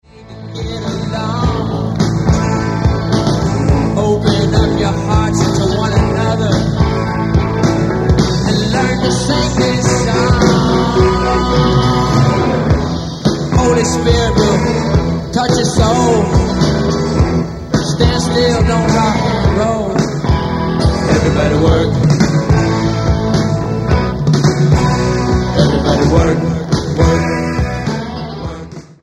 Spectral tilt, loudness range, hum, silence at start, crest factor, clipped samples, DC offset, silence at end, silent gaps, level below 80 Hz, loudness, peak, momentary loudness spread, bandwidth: -6 dB/octave; 2 LU; none; 0.15 s; 12 dB; under 0.1%; under 0.1%; 0.15 s; none; -22 dBFS; -13 LUFS; 0 dBFS; 5 LU; 12 kHz